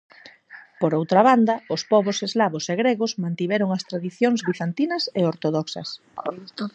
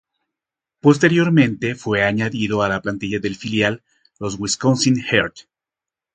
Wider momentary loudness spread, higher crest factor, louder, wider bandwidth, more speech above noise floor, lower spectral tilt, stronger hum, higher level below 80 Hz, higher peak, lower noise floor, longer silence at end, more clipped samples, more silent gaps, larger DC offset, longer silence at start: first, 14 LU vs 10 LU; about the same, 20 dB vs 18 dB; second, -22 LUFS vs -18 LUFS; second, 8.4 kHz vs 9.4 kHz; second, 25 dB vs 70 dB; about the same, -5.5 dB/octave vs -5 dB/octave; neither; second, -72 dBFS vs -52 dBFS; about the same, -2 dBFS vs 0 dBFS; second, -47 dBFS vs -88 dBFS; second, 0.05 s vs 0.75 s; neither; neither; neither; second, 0.25 s vs 0.85 s